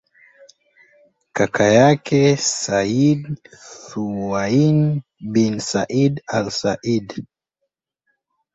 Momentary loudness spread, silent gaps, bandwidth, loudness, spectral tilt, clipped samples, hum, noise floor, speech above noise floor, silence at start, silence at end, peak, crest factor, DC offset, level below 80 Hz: 16 LU; none; 8.2 kHz; -18 LUFS; -5.5 dB/octave; under 0.1%; none; -77 dBFS; 59 dB; 1.35 s; 1.3 s; -2 dBFS; 18 dB; under 0.1%; -54 dBFS